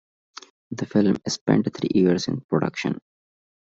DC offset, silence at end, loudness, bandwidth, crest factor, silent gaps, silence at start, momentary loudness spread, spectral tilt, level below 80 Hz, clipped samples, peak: under 0.1%; 0.65 s; -23 LUFS; 7.8 kHz; 20 dB; 1.41-1.46 s, 2.44-2.49 s; 0.7 s; 18 LU; -6 dB/octave; -60 dBFS; under 0.1%; -4 dBFS